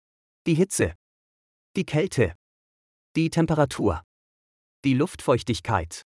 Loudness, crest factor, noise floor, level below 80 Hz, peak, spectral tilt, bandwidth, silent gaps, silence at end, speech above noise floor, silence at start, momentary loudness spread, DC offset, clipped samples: -25 LUFS; 18 dB; under -90 dBFS; -50 dBFS; -8 dBFS; -6 dB/octave; 12 kHz; 0.95-1.74 s, 2.35-3.15 s, 4.04-4.83 s; 0.1 s; over 67 dB; 0.45 s; 8 LU; under 0.1%; under 0.1%